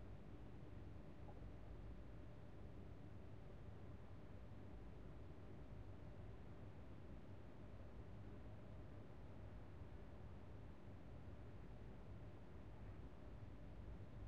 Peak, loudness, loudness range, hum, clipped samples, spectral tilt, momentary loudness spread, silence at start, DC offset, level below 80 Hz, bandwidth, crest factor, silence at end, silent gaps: -44 dBFS; -60 LUFS; 0 LU; none; under 0.1%; -7.5 dB/octave; 1 LU; 0 s; 0.1%; -62 dBFS; 7.6 kHz; 12 dB; 0 s; none